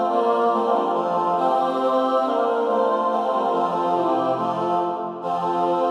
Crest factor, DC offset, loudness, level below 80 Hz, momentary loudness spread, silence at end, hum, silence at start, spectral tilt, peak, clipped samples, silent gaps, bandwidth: 12 dB; under 0.1%; -21 LUFS; -78 dBFS; 3 LU; 0 s; none; 0 s; -6.5 dB/octave; -8 dBFS; under 0.1%; none; 10 kHz